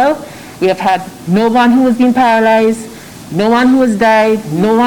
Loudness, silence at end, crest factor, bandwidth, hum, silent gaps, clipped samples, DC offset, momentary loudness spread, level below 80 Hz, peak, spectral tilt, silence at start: -11 LUFS; 0 s; 8 dB; 17.5 kHz; none; none; under 0.1%; under 0.1%; 12 LU; -48 dBFS; -2 dBFS; -6 dB/octave; 0 s